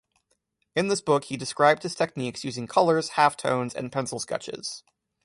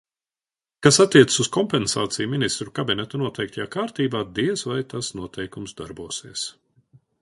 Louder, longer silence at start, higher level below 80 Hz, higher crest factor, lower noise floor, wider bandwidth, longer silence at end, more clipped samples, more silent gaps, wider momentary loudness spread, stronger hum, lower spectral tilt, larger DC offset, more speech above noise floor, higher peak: second, -26 LUFS vs -22 LUFS; about the same, 0.75 s vs 0.8 s; second, -66 dBFS vs -56 dBFS; about the same, 20 dB vs 22 dB; second, -74 dBFS vs under -90 dBFS; about the same, 11.5 kHz vs 11.5 kHz; second, 0.45 s vs 0.7 s; neither; neither; second, 12 LU vs 17 LU; neither; about the same, -4 dB/octave vs -4 dB/octave; neither; second, 48 dB vs over 68 dB; second, -6 dBFS vs 0 dBFS